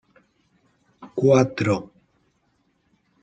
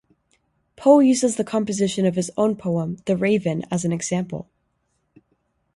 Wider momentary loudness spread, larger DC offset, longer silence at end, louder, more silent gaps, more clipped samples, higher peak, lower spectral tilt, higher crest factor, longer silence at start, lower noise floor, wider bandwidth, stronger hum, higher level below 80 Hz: about the same, 10 LU vs 10 LU; neither; about the same, 1.35 s vs 1.35 s; about the same, -21 LUFS vs -21 LUFS; neither; neither; about the same, -4 dBFS vs -2 dBFS; about the same, -7 dB/octave vs -6 dB/octave; about the same, 22 dB vs 20 dB; first, 1 s vs 0.8 s; about the same, -68 dBFS vs -71 dBFS; second, 9 kHz vs 11.5 kHz; neither; about the same, -64 dBFS vs -60 dBFS